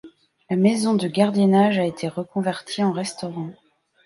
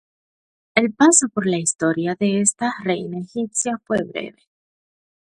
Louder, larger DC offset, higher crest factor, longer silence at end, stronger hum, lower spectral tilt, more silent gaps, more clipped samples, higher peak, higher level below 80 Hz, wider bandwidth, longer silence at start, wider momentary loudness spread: about the same, -21 LUFS vs -19 LUFS; neither; about the same, 18 dB vs 22 dB; second, 0.55 s vs 0.9 s; neither; first, -6 dB/octave vs -3.5 dB/octave; neither; neither; second, -4 dBFS vs 0 dBFS; about the same, -68 dBFS vs -64 dBFS; about the same, 11.5 kHz vs 11.5 kHz; second, 0.05 s vs 0.75 s; about the same, 13 LU vs 13 LU